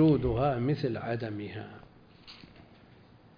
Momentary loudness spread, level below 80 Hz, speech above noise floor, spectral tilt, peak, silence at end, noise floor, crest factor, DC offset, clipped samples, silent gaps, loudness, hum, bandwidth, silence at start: 23 LU; -50 dBFS; 28 dB; -10 dB/octave; -16 dBFS; 1 s; -57 dBFS; 16 dB; under 0.1%; under 0.1%; none; -31 LUFS; none; 5.2 kHz; 0 s